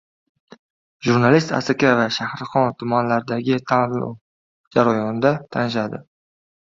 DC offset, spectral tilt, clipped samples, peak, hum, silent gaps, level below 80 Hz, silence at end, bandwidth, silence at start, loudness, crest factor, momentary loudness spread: under 0.1%; -6.5 dB/octave; under 0.1%; 0 dBFS; none; 4.21-4.71 s; -58 dBFS; 0.65 s; 7.6 kHz; 1 s; -20 LUFS; 20 dB; 9 LU